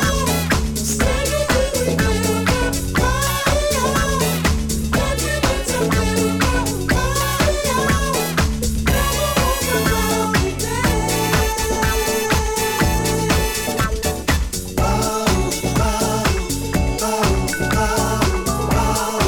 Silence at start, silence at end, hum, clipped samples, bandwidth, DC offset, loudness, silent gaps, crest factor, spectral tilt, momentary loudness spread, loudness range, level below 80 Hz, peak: 0 s; 0 s; none; under 0.1%; 19.5 kHz; under 0.1%; -18 LUFS; none; 14 dB; -4 dB/octave; 3 LU; 1 LU; -26 dBFS; -4 dBFS